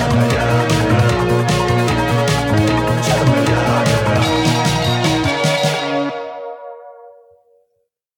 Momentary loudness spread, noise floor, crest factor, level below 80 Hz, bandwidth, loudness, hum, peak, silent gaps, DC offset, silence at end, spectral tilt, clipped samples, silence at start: 7 LU; -68 dBFS; 14 dB; -34 dBFS; 17 kHz; -15 LUFS; none; -2 dBFS; none; under 0.1%; 1.05 s; -5.5 dB/octave; under 0.1%; 0 s